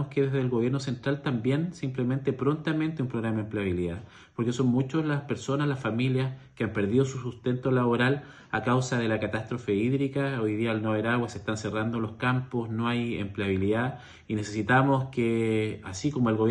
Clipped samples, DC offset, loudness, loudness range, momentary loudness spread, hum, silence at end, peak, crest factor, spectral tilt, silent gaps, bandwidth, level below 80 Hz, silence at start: under 0.1%; under 0.1%; -28 LUFS; 2 LU; 7 LU; none; 0 s; -10 dBFS; 18 dB; -7 dB/octave; none; 10 kHz; -58 dBFS; 0 s